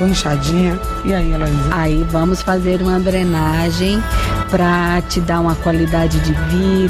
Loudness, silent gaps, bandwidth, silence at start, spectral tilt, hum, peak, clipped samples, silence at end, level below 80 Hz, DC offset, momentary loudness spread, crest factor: -16 LUFS; none; 15.5 kHz; 0 s; -6 dB/octave; none; -4 dBFS; under 0.1%; 0 s; -22 dBFS; under 0.1%; 3 LU; 10 dB